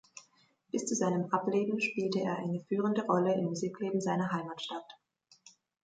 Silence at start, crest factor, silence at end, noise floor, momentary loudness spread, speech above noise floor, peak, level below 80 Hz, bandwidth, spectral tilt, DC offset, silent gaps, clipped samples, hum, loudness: 0.15 s; 18 dB; 0.35 s; -69 dBFS; 10 LU; 37 dB; -16 dBFS; -78 dBFS; 9.4 kHz; -5.5 dB/octave; under 0.1%; none; under 0.1%; none; -33 LUFS